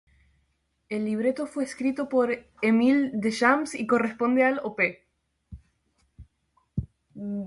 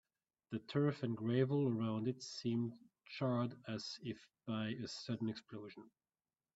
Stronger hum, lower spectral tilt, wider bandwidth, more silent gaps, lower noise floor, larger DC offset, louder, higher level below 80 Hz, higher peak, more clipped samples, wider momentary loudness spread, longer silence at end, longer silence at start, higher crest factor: neither; about the same, -6 dB/octave vs -6.5 dB/octave; first, 11.5 kHz vs 8 kHz; neither; second, -72 dBFS vs under -90 dBFS; neither; first, -25 LUFS vs -41 LUFS; first, -54 dBFS vs -80 dBFS; first, -8 dBFS vs -22 dBFS; neither; about the same, 14 LU vs 14 LU; second, 0 s vs 0.7 s; first, 0.9 s vs 0.5 s; about the same, 20 dB vs 20 dB